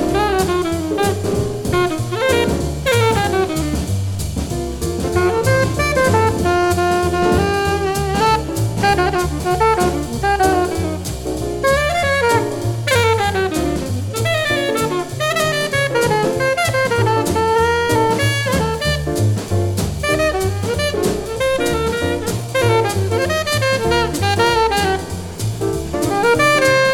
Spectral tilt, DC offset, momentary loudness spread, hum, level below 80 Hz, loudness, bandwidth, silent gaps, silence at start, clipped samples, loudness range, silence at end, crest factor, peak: -5 dB/octave; under 0.1%; 6 LU; none; -32 dBFS; -17 LUFS; 19 kHz; none; 0 s; under 0.1%; 2 LU; 0 s; 14 dB; -2 dBFS